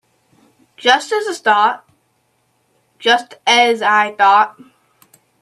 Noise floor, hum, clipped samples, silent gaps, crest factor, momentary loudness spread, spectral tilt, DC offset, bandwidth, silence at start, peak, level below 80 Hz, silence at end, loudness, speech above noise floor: -63 dBFS; none; under 0.1%; none; 16 dB; 8 LU; -1 dB/octave; under 0.1%; 13.5 kHz; 0.85 s; 0 dBFS; -72 dBFS; 0.9 s; -14 LUFS; 49 dB